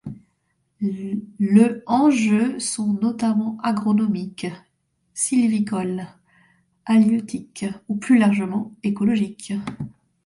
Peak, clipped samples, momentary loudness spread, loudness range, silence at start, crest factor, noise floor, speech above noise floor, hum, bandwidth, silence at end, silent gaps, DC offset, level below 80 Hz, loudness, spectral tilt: -4 dBFS; under 0.1%; 15 LU; 3 LU; 0.05 s; 18 dB; -70 dBFS; 50 dB; none; 11.5 kHz; 0.35 s; none; under 0.1%; -62 dBFS; -21 LUFS; -5.5 dB/octave